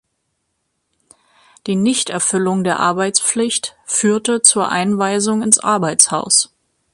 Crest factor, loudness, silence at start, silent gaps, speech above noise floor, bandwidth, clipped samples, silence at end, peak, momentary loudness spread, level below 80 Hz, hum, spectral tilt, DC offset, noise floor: 18 dB; -15 LUFS; 1.65 s; none; 55 dB; 14.5 kHz; under 0.1%; 0.5 s; 0 dBFS; 7 LU; -62 dBFS; none; -2.5 dB/octave; under 0.1%; -71 dBFS